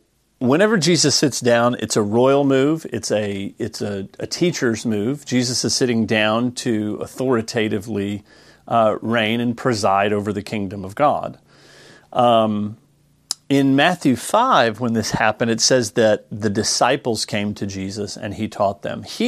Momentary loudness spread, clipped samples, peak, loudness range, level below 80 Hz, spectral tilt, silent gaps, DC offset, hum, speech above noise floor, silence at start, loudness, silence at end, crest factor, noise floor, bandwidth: 11 LU; under 0.1%; 0 dBFS; 4 LU; -58 dBFS; -4 dB/octave; none; under 0.1%; none; 38 dB; 0.4 s; -19 LUFS; 0 s; 18 dB; -57 dBFS; 15 kHz